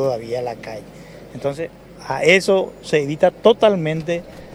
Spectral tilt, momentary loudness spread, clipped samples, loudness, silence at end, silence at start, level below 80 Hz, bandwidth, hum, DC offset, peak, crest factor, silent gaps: -5 dB/octave; 18 LU; under 0.1%; -18 LUFS; 0 s; 0 s; -52 dBFS; 15.5 kHz; none; under 0.1%; 0 dBFS; 18 dB; none